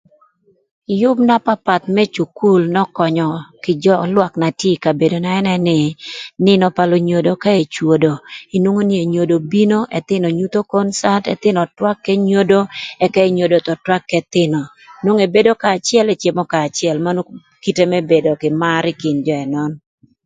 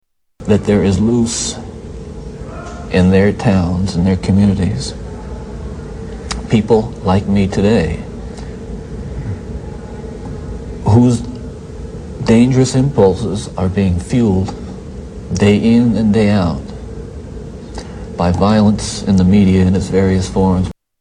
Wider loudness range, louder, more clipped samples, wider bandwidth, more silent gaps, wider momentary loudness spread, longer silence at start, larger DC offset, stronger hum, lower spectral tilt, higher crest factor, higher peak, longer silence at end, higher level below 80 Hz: second, 1 LU vs 5 LU; about the same, -15 LUFS vs -14 LUFS; neither; second, 9.4 kHz vs 10.5 kHz; neither; second, 8 LU vs 18 LU; first, 0.9 s vs 0.4 s; neither; neither; about the same, -6 dB/octave vs -6.5 dB/octave; about the same, 16 dB vs 14 dB; about the same, 0 dBFS vs 0 dBFS; first, 0.5 s vs 0.3 s; second, -58 dBFS vs -30 dBFS